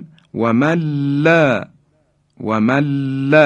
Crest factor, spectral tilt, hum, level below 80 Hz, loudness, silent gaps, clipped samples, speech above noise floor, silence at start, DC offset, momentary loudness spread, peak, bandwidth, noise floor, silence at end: 16 dB; -7.5 dB/octave; none; -56 dBFS; -16 LUFS; none; under 0.1%; 46 dB; 0 s; under 0.1%; 12 LU; 0 dBFS; 9 kHz; -60 dBFS; 0 s